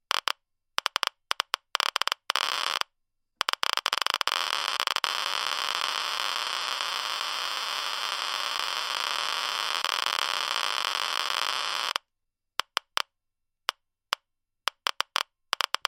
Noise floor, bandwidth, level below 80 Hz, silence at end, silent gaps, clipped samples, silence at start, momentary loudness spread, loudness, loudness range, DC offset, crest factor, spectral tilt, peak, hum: -82 dBFS; 16.5 kHz; -80 dBFS; 0.65 s; none; under 0.1%; 0.15 s; 8 LU; -28 LUFS; 5 LU; under 0.1%; 28 dB; 2.5 dB/octave; -4 dBFS; none